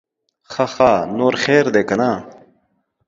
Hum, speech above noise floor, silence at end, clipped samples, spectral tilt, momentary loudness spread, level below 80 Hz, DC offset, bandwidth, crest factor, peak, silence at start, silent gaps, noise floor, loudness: none; 50 dB; 0.75 s; under 0.1%; -5.5 dB/octave; 9 LU; -52 dBFS; under 0.1%; 7.8 kHz; 18 dB; 0 dBFS; 0.5 s; none; -66 dBFS; -16 LUFS